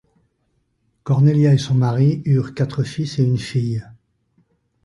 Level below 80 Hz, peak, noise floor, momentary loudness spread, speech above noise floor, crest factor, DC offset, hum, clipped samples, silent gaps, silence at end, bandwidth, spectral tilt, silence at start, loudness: -52 dBFS; -4 dBFS; -67 dBFS; 9 LU; 50 dB; 14 dB; under 0.1%; none; under 0.1%; none; 0.95 s; 11 kHz; -8 dB/octave; 1.05 s; -18 LUFS